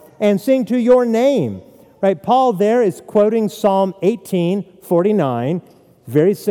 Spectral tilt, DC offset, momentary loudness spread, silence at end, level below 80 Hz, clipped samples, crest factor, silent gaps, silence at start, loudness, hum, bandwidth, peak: -7 dB/octave; under 0.1%; 7 LU; 0 s; -62 dBFS; under 0.1%; 14 dB; none; 0.2 s; -16 LUFS; none; 18 kHz; -2 dBFS